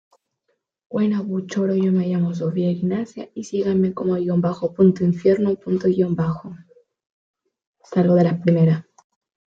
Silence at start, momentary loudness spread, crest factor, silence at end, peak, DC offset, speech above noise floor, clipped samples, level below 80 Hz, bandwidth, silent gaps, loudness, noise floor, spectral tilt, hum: 0.9 s; 9 LU; 16 dB; 0.7 s; -4 dBFS; under 0.1%; 53 dB; under 0.1%; -60 dBFS; 7.4 kHz; 7.06-7.34 s, 7.67-7.74 s; -20 LUFS; -73 dBFS; -9 dB/octave; none